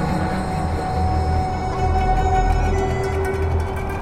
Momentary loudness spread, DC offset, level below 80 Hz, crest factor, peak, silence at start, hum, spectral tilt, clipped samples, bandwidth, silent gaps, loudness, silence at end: 4 LU; under 0.1%; -26 dBFS; 14 dB; -6 dBFS; 0 s; none; -7 dB/octave; under 0.1%; 13 kHz; none; -21 LUFS; 0 s